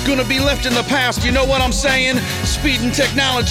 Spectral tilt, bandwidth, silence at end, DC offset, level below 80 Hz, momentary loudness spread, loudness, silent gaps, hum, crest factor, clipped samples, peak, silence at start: -3.5 dB/octave; 17.5 kHz; 0 s; under 0.1%; -26 dBFS; 3 LU; -16 LUFS; none; none; 14 dB; under 0.1%; -2 dBFS; 0 s